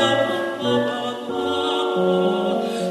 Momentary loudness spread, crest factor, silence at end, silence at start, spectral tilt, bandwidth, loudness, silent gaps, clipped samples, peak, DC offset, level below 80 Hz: 6 LU; 14 dB; 0 s; 0 s; -5 dB/octave; 13 kHz; -21 LUFS; none; under 0.1%; -6 dBFS; under 0.1%; -64 dBFS